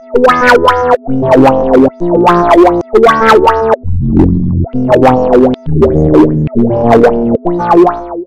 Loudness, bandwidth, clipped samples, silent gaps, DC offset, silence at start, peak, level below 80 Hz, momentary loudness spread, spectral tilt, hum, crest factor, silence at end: -8 LUFS; 14 kHz; 4%; none; under 0.1%; 0.05 s; 0 dBFS; -26 dBFS; 6 LU; -7.5 dB/octave; none; 8 dB; 0 s